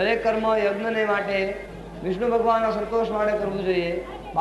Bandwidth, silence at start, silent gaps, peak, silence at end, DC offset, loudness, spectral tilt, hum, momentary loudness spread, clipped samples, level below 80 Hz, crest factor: 12 kHz; 0 s; none; -8 dBFS; 0 s; under 0.1%; -24 LUFS; -6 dB/octave; none; 9 LU; under 0.1%; -46 dBFS; 14 dB